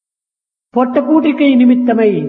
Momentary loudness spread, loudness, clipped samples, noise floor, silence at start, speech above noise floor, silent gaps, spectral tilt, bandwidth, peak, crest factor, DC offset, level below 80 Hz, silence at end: 6 LU; -11 LUFS; under 0.1%; -86 dBFS; 0.75 s; 76 dB; none; -9.5 dB/octave; 4.1 kHz; 0 dBFS; 12 dB; under 0.1%; -62 dBFS; 0 s